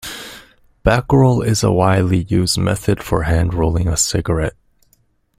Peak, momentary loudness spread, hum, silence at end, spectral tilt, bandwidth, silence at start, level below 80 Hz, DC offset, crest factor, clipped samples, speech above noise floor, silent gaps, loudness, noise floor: 0 dBFS; 7 LU; none; 0.9 s; -5.5 dB/octave; 16 kHz; 0.05 s; -32 dBFS; under 0.1%; 16 dB; under 0.1%; 44 dB; none; -16 LUFS; -59 dBFS